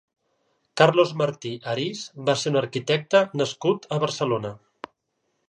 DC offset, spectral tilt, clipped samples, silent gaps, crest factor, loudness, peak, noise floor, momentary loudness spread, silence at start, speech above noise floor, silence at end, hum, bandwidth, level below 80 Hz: under 0.1%; -5 dB/octave; under 0.1%; none; 22 dB; -23 LUFS; -2 dBFS; -75 dBFS; 17 LU; 0.75 s; 52 dB; 0.9 s; none; 10.5 kHz; -70 dBFS